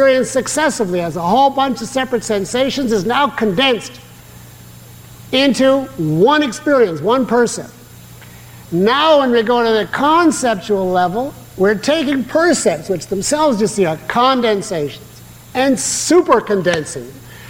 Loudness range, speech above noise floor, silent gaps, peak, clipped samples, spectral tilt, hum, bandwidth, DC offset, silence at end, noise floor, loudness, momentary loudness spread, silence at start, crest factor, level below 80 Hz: 3 LU; 23 dB; none; -2 dBFS; under 0.1%; -4 dB/octave; none; 17 kHz; under 0.1%; 0 s; -38 dBFS; -15 LUFS; 9 LU; 0 s; 14 dB; -48 dBFS